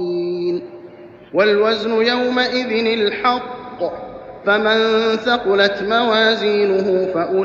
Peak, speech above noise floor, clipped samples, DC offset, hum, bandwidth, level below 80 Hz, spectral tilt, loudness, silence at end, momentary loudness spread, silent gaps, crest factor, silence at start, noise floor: -2 dBFS; 23 dB; under 0.1%; under 0.1%; none; 7.2 kHz; -56 dBFS; -5 dB/octave; -17 LUFS; 0 s; 11 LU; none; 16 dB; 0 s; -39 dBFS